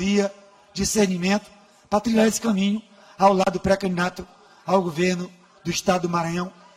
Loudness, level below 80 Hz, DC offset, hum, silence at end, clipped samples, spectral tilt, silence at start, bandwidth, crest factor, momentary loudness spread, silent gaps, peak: -22 LUFS; -50 dBFS; under 0.1%; none; 0.25 s; under 0.1%; -5 dB/octave; 0 s; 16 kHz; 18 dB; 11 LU; none; -4 dBFS